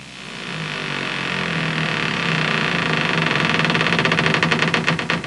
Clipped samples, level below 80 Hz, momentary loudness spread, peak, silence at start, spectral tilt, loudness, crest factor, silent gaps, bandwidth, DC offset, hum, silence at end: under 0.1%; -56 dBFS; 8 LU; -2 dBFS; 0 s; -4.5 dB/octave; -19 LUFS; 18 dB; none; 11.5 kHz; 0.2%; none; 0 s